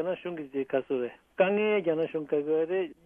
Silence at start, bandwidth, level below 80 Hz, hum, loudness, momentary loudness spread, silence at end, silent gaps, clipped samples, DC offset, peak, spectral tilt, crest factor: 0 s; 3.6 kHz; -72 dBFS; none; -29 LUFS; 9 LU; 0.15 s; none; under 0.1%; under 0.1%; -10 dBFS; -8.5 dB/octave; 18 dB